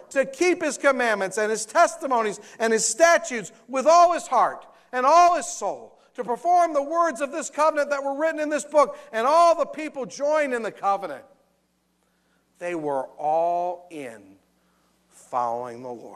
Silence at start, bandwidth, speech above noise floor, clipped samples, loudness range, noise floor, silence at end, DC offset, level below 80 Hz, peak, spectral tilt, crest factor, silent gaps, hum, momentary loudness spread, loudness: 0.1 s; 13.5 kHz; 46 dB; under 0.1%; 9 LU; -69 dBFS; 0 s; under 0.1%; -68 dBFS; -6 dBFS; -2.5 dB/octave; 18 dB; none; none; 15 LU; -22 LUFS